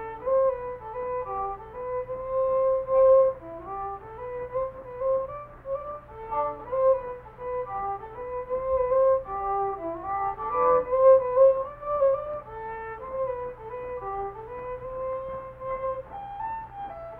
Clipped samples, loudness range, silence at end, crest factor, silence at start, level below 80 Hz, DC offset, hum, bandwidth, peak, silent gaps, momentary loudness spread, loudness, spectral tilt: under 0.1%; 11 LU; 0 s; 18 dB; 0 s; -52 dBFS; under 0.1%; 60 Hz at -65 dBFS; 3.3 kHz; -8 dBFS; none; 16 LU; -27 LUFS; -9 dB/octave